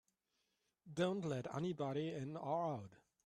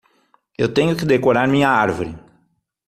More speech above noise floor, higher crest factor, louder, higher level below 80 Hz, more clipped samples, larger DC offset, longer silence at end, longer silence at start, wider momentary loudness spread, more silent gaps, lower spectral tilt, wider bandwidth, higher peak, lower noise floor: second, 44 dB vs 48 dB; about the same, 18 dB vs 16 dB; second, -43 LUFS vs -17 LUFS; second, -80 dBFS vs -50 dBFS; neither; neither; second, 0.3 s vs 0.7 s; first, 0.85 s vs 0.6 s; about the same, 9 LU vs 9 LU; neither; about the same, -7 dB/octave vs -6.5 dB/octave; second, 11.5 kHz vs 14.5 kHz; second, -26 dBFS vs -2 dBFS; first, -86 dBFS vs -65 dBFS